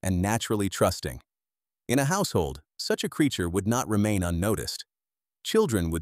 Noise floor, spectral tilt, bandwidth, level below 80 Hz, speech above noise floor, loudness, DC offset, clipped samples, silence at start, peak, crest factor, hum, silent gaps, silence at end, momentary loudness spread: under -90 dBFS; -5 dB/octave; 16 kHz; -46 dBFS; over 64 dB; -27 LUFS; under 0.1%; under 0.1%; 0.05 s; -10 dBFS; 18 dB; none; none; 0 s; 12 LU